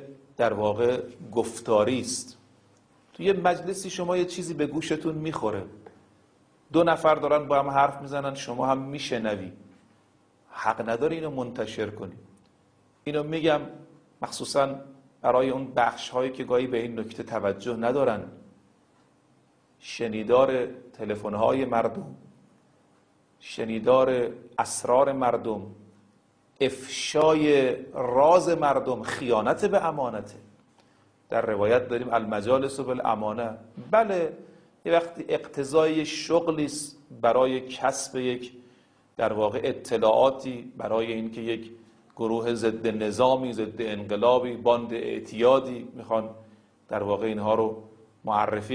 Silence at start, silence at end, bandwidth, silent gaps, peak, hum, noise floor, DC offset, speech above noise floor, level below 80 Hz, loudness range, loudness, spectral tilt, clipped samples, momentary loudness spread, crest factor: 0 s; 0 s; 10.5 kHz; none; -8 dBFS; none; -63 dBFS; under 0.1%; 37 dB; -62 dBFS; 6 LU; -26 LUFS; -5 dB/octave; under 0.1%; 13 LU; 20 dB